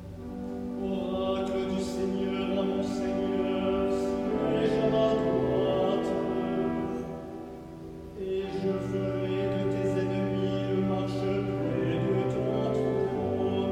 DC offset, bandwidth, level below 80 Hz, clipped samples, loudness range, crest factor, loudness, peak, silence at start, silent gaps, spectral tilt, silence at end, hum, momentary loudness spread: under 0.1%; 11.5 kHz; -50 dBFS; under 0.1%; 5 LU; 14 dB; -29 LUFS; -14 dBFS; 0 s; none; -7.5 dB/octave; 0 s; none; 10 LU